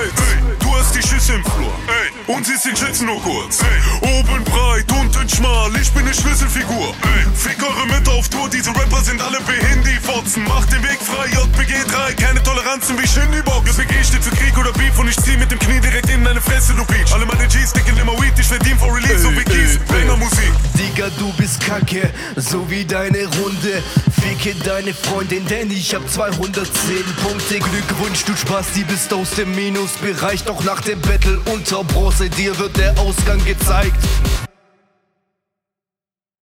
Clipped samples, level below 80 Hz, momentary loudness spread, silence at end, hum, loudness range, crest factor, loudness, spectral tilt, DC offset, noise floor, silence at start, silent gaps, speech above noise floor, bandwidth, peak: under 0.1%; -18 dBFS; 5 LU; 1.95 s; none; 4 LU; 14 dB; -16 LUFS; -4 dB/octave; under 0.1%; under -90 dBFS; 0 s; none; over 75 dB; 16 kHz; 0 dBFS